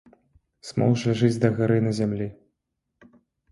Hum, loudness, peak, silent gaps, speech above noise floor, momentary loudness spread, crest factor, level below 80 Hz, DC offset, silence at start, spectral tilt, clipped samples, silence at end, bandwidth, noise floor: none; -24 LUFS; -6 dBFS; none; 57 dB; 11 LU; 20 dB; -56 dBFS; under 0.1%; 0.65 s; -7.5 dB/octave; under 0.1%; 1.2 s; 11.5 kHz; -80 dBFS